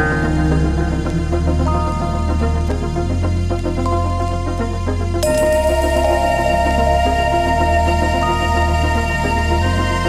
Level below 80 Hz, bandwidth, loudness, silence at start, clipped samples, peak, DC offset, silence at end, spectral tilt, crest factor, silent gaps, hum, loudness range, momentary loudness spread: -22 dBFS; 14 kHz; -17 LUFS; 0 s; under 0.1%; -4 dBFS; under 0.1%; 0 s; -6 dB/octave; 12 dB; none; none; 4 LU; 5 LU